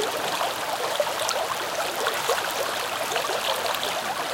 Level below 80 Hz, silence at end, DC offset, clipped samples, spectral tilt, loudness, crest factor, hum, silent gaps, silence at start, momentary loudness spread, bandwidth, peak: -64 dBFS; 0 s; under 0.1%; under 0.1%; -1 dB/octave; -26 LUFS; 22 dB; none; none; 0 s; 2 LU; 17 kHz; -4 dBFS